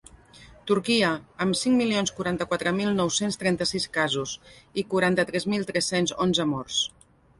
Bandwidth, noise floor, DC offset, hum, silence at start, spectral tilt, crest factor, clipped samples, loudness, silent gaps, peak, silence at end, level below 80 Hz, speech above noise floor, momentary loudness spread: 11.5 kHz; -51 dBFS; under 0.1%; none; 0.35 s; -4 dB/octave; 16 dB; under 0.1%; -25 LUFS; none; -8 dBFS; 0.5 s; -58 dBFS; 26 dB; 7 LU